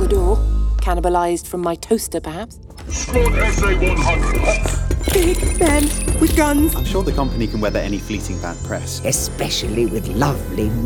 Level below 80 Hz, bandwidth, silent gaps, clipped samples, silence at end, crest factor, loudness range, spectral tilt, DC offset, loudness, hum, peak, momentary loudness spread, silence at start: -22 dBFS; 19 kHz; none; under 0.1%; 0 s; 16 dB; 4 LU; -5 dB/octave; under 0.1%; -19 LUFS; none; -2 dBFS; 9 LU; 0 s